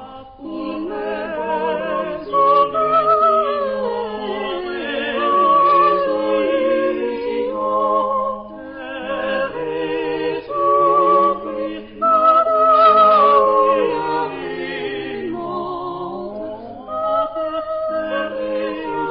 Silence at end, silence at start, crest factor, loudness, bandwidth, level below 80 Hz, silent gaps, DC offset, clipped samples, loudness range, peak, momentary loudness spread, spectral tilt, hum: 0 s; 0 s; 16 dB; -18 LUFS; 5.4 kHz; -54 dBFS; none; under 0.1%; under 0.1%; 10 LU; -2 dBFS; 14 LU; -9.5 dB/octave; none